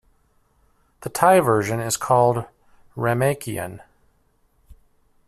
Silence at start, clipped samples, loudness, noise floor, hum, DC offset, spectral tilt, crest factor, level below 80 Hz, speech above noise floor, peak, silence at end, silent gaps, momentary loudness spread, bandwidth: 1 s; under 0.1%; -20 LUFS; -63 dBFS; none; under 0.1%; -5 dB/octave; 20 dB; -56 dBFS; 43 dB; -2 dBFS; 1.5 s; none; 19 LU; 15 kHz